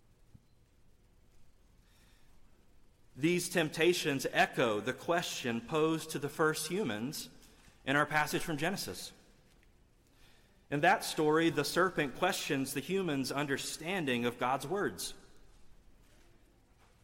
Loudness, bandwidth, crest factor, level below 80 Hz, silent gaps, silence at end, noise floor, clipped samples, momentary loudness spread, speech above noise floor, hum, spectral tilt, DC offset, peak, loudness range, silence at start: -33 LUFS; 16.5 kHz; 18 dB; -64 dBFS; none; 1.3 s; -65 dBFS; under 0.1%; 10 LU; 32 dB; none; -4 dB/octave; under 0.1%; -16 dBFS; 5 LU; 1.4 s